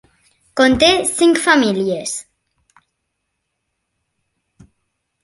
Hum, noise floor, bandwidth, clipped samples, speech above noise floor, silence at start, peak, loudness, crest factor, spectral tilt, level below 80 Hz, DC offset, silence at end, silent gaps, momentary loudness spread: none; -74 dBFS; 12 kHz; under 0.1%; 60 dB; 0.55 s; 0 dBFS; -14 LUFS; 18 dB; -3 dB/octave; -48 dBFS; under 0.1%; 3 s; none; 14 LU